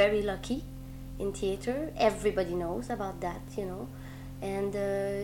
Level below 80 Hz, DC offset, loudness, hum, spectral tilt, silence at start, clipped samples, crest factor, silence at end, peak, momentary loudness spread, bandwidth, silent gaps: -46 dBFS; under 0.1%; -33 LUFS; none; -5.5 dB/octave; 0 s; under 0.1%; 22 dB; 0 s; -10 dBFS; 15 LU; 18 kHz; none